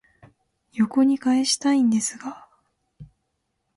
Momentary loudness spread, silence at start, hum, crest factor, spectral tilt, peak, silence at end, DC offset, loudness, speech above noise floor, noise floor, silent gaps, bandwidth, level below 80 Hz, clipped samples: 17 LU; 0.75 s; none; 14 dB; -3.5 dB/octave; -10 dBFS; 0.7 s; under 0.1%; -21 LUFS; 55 dB; -75 dBFS; none; 11.5 kHz; -66 dBFS; under 0.1%